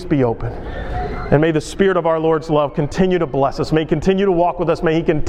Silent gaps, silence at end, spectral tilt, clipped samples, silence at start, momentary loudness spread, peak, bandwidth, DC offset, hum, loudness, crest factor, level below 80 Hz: none; 0 s; -7 dB/octave; under 0.1%; 0 s; 10 LU; 0 dBFS; 11.5 kHz; under 0.1%; none; -17 LUFS; 16 dB; -32 dBFS